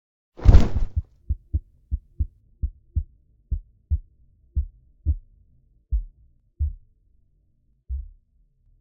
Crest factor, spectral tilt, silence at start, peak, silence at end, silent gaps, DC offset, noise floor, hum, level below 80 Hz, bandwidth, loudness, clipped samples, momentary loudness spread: 24 dB; -8.5 dB/octave; 0.4 s; 0 dBFS; 0.8 s; none; under 0.1%; -64 dBFS; none; -26 dBFS; 7.2 kHz; -28 LUFS; under 0.1%; 16 LU